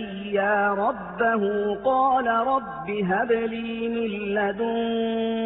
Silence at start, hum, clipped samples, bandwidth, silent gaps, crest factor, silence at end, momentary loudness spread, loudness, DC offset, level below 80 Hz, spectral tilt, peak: 0 s; none; under 0.1%; 4.1 kHz; none; 12 dB; 0 s; 6 LU; -24 LUFS; under 0.1%; -56 dBFS; -10 dB/octave; -10 dBFS